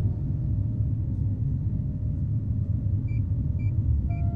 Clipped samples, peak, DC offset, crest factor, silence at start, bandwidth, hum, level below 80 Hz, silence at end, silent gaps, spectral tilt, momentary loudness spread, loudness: under 0.1%; -14 dBFS; under 0.1%; 12 dB; 0 s; 2.6 kHz; none; -32 dBFS; 0 s; none; -12.5 dB/octave; 3 LU; -28 LUFS